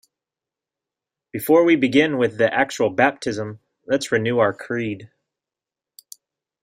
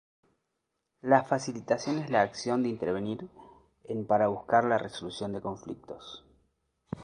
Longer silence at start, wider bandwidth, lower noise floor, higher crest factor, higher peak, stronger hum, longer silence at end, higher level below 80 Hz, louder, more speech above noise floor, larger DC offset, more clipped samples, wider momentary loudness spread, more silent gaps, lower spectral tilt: first, 1.35 s vs 1.05 s; first, 16 kHz vs 10.5 kHz; first, -89 dBFS vs -82 dBFS; about the same, 20 dB vs 24 dB; first, -2 dBFS vs -6 dBFS; neither; first, 1.55 s vs 0 s; about the same, -62 dBFS vs -66 dBFS; first, -20 LUFS vs -29 LUFS; first, 69 dB vs 53 dB; neither; neither; second, 14 LU vs 18 LU; neither; about the same, -5.5 dB/octave vs -5.5 dB/octave